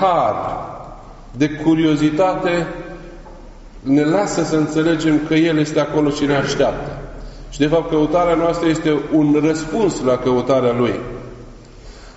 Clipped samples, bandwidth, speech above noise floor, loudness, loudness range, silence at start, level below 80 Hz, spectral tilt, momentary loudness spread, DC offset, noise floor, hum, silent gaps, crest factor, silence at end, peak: under 0.1%; 8 kHz; 21 dB; -17 LUFS; 2 LU; 0 s; -38 dBFS; -5.5 dB/octave; 18 LU; under 0.1%; -38 dBFS; none; none; 14 dB; 0.05 s; -2 dBFS